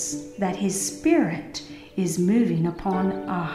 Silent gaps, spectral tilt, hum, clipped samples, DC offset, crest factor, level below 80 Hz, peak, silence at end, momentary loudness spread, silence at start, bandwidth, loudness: none; -5.5 dB/octave; none; under 0.1%; under 0.1%; 16 dB; -52 dBFS; -8 dBFS; 0 s; 11 LU; 0 s; 15.5 kHz; -24 LUFS